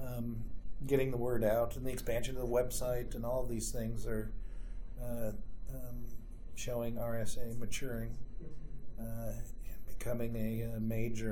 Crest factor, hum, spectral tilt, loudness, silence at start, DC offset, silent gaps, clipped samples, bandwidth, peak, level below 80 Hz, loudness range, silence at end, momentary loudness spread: 16 dB; none; -6 dB/octave; -39 LUFS; 0 s; under 0.1%; none; under 0.1%; 19 kHz; -20 dBFS; -44 dBFS; 8 LU; 0 s; 16 LU